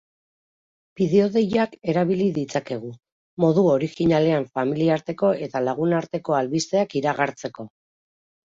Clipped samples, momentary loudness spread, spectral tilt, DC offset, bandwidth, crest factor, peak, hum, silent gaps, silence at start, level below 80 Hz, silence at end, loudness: under 0.1%; 13 LU; -6.5 dB/octave; under 0.1%; 7.8 kHz; 18 dB; -6 dBFS; none; 3.12-3.37 s; 1 s; -60 dBFS; 0.9 s; -22 LUFS